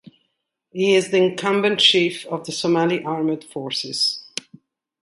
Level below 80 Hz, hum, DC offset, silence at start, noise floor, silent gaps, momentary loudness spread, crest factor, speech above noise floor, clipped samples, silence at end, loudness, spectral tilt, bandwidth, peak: -68 dBFS; none; under 0.1%; 0.75 s; -74 dBFS; none; 14 LU; 20 dB; 55 dB; under 0.1%; 0.8 s; -19 LUFS; -4 dB/octave; 11.5 kHz; -2 dBFS